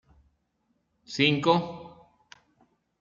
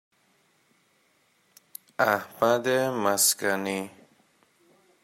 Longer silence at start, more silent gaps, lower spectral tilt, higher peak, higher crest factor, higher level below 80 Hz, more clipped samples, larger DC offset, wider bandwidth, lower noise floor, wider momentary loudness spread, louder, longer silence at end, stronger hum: second, 1.1 s vs 2 s; neither; first, -5.5 dB/octave vs -2.5 dB/octave; about the same, -8 dBFS vs -8 dBFS; about the same, 22 dB vs 22 dB; first, -68 dBFS vs -76 dBFS; neither; neither; second, 7.6 kHz vs 16 kHz; first, -74 dBFS vs -67 dBFS; about the same, 18 LU vs 20 LU; about the same, -25 LUFS vs -25 LUFS; about the same, 1.1 s vs 1.15 s; neither